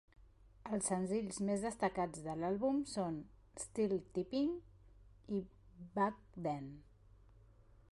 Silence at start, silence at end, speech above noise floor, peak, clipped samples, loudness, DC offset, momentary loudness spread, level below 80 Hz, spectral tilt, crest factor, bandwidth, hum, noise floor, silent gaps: 0.2 s; 0.6 s; 25 dB; -24 dBFS; under 0.1%; -40 LUFS; under 0.1%; 12 LU; -64 dBFS; -5.5 dB/octave; 16 dB; 11.5 kHz; none; -64 dBFS; none